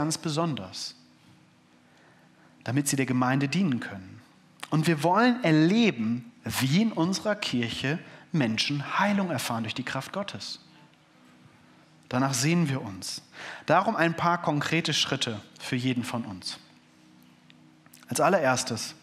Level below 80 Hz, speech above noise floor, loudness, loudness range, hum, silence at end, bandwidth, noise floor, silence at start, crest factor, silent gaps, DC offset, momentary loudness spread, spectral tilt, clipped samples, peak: -72 dBFS; 33 dB; -27 LUFS; 6 LU; none; 0.1 s; 15.5 kHz; -59 dBFS; 0 s; 22 dB; none; under 0.1%; 14 LU; -4.5 dB/octave; under 0.1%; -6 dBFS